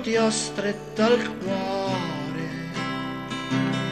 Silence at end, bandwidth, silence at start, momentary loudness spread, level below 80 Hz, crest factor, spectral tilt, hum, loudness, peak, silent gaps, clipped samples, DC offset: 0 s; 13.5 kHz; 0 s; 9 LU; -54 dBFS; 16 dB; -4.5 dB/octave; none; -26 LUFS; -10 dBFS; none; under 0.1%; under 0.1%